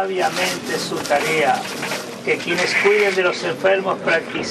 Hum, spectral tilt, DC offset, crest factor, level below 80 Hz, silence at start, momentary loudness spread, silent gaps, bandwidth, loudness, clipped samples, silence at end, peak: none; -3 dB/octave; under 0.1%; 16 dB; -62 dBFS; 0 s; 8 LU; none; 13.5 kHz; -19 LUFS; under 0.1%; 0 s; -4 dBFS